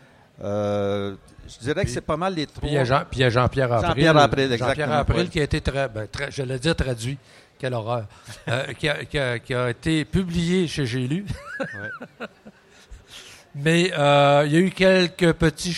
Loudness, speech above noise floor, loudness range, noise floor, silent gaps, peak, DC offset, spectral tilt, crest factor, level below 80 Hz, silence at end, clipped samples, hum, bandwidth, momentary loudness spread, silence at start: -22 LUFS; 27 dB; 7 LU; -49 dBFS; none; -2 dBFS; under 0.1%; -5.5 dB/octave; 20 dB; -40 dBFS; 0 s; under 0.1%; none; 13 kHz; 17 LU; 0.4 s